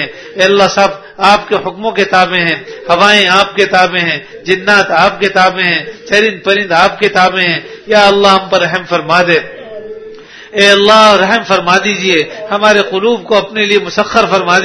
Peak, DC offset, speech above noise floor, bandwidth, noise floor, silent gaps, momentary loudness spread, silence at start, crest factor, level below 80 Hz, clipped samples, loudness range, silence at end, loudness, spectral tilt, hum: 0 dBFS; under 0.1%; 21 dB; 11 kHz; -31 dBFS; none; 9 LU; 0 s; 10 dB; -46 dBFS; 1%; 2 LU; 0 s; -9 LUFS; -3.5 dB/octave; none